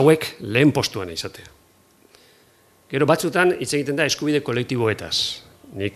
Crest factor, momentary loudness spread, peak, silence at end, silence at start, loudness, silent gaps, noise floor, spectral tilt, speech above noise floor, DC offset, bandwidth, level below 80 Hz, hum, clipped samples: 20 dB; 12 LU; -2 dBFS; 0.05 s; 0 s; -21 LUFS; none; -56 dBFS; -4.5 dB/octave; 36 dB; under 0.1%; 14.5 kHz; -56 dBFS; none; under 0.1%